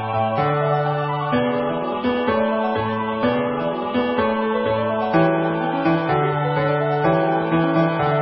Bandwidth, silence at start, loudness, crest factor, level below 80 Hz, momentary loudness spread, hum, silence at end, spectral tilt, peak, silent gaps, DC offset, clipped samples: 5.8 kHz; 0 s; -20 LUFS; 14 dB; -50 dBFS; 4 LU; none; 0 s; -12 dB/octave; -6 dBFS; none; under 0.1%; under 0.1%